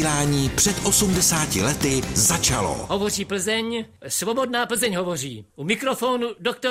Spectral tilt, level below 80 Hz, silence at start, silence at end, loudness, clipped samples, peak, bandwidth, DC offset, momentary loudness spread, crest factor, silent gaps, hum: -3 dB/octave; -42 dBFS; 0 s; 0 s; -21 LUFS; under 0.1%; -6 dBFS; 16 kHz; under 0.1%; 9 LU; 16 dB; none; none